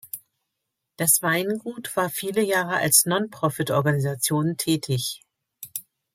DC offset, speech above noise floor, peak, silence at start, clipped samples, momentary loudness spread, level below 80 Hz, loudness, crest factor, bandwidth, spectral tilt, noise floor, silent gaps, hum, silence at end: under 0.1%; 58 dB; -2 dBFS; 0.05 s; under 0.1%; 17 LU; -64 dBFS; -22 LUFS; 22 dB; 16.5 kHz; -3.5 dB/octave; -81 dBFS; none; none; 0.35 s